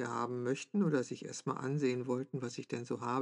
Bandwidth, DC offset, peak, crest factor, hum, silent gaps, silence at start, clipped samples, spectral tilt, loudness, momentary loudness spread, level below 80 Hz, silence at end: 11 kHz; under 0.1%; -20 dBFS; 16 dB; none; none; 0 s; under 0.1%; -6 dB/octave; -37 LUFS; 8 LU; under -90 dBFS; 0 s